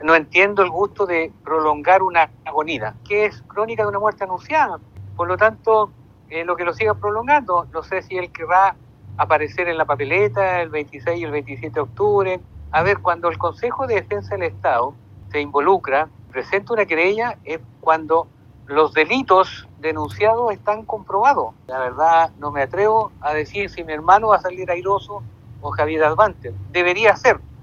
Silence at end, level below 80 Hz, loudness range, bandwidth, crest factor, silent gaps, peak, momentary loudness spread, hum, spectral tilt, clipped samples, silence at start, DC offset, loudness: 0 s; -50 dBFS; 3 LU; 7.2 kHz; 20 dB; none; 0 dBFS; 11 LU; none; -6 dB/octave; under 0.1%; 0 s; under 0.1%; -19 LUFS